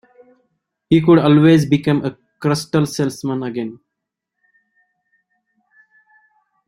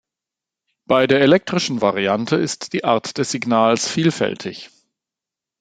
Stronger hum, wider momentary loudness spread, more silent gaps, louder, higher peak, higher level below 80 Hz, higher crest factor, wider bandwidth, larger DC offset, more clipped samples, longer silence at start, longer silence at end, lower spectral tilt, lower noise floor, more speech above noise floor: neither; first, 14 LU vs 9 LU; neither; about the same, -16 LUFS vs -18 LUFS; about the same, -2 dBFS vs 0 dBFS; about the same, -56 dBFS vs -60 dBFS; about the same, 18 dB vs 20 dB; first, 13 kHz vs 9.4 kHz; neither; neither; about the same, 0.9 s vs 0.9 s; first, 2.95 s vs 0.95 s; first, -7 dB/octave vs -4.5 dB/octave; second, -80 dBFS vs -87 dBFS; about the same, 66 dB vs 69 dB